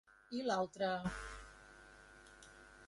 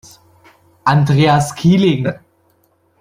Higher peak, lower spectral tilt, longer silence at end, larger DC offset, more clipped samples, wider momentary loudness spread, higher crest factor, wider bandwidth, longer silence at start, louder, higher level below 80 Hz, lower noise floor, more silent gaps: second, -26 dBFS vs -2 dBFS; second, -5 dB/octave vs -6.5 dB/octave; second, 0 s vs 0.85 s; neither; neither; first, 21 LU vs 9 LU; about the same, 18 dB vs 14 dB; second, 11.5 kHz vs 15.5 kHz; second, 0.3 s vs 0.85 s; second, -41 LUFS vs -14 LUFS; second, -62 dBFS vs -48 dBFS; about the same, -60 dBFS vs -58 dBFS; neither